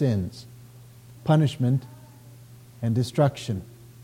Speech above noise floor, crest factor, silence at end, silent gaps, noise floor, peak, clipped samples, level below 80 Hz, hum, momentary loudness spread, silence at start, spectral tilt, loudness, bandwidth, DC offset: 24 dB; 16 dB; 0 s; none; -47 dBFS; -10 dBFS; under 0.1%; -58 dBFS; none; 23 LU; 0 s; -7.5 dB/octave; -25 LUFS; 16 kHz; under 0.1%